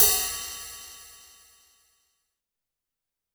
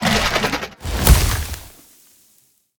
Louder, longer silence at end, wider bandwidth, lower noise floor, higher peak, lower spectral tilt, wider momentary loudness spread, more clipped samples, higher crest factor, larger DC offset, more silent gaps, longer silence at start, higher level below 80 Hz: second, -26 LUFS vs -18 LUFS; first, 2.25 s vs 1.1 s; about the same, over 20 kHz vs over 20 kHz; first, -87 dBFS vs -58 dBFS; about the same, -2 dBFS vs 0 dBFS; second, 1 dB/octave vs -4 dB/octave; first, 25 LU vs 14 LU; neither; first, 30 dB vs 20 dB; neither; neither; about the same, 0 s vs 0 s; second, -54 dBFS vs -22 dBFS